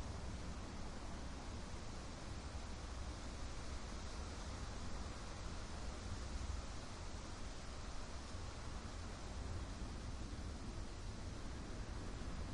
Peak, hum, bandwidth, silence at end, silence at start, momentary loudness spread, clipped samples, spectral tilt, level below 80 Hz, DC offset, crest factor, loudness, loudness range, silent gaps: -34 dBFS; none; 11.5 kHz; 0 s; 0 s; 2 LU; under 0.1%; -4.5 dB/octave; -50 dBFS; under 0.1%; 14 dB; -50 LUFS; 1 LU; none